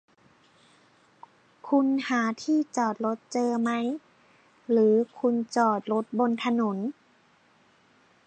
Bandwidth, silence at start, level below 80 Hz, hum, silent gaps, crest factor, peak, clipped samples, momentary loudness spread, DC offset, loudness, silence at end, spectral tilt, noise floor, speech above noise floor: 9.4 kHz; 1.65 s; -82 dBFS; none; none; 18 dB; -10 dBFS; under 0.1%; 9 LU; under 0.1%; -26 LUFS; 1.35 s; -5.5 dB/octave; -62 dBFS; 37 dB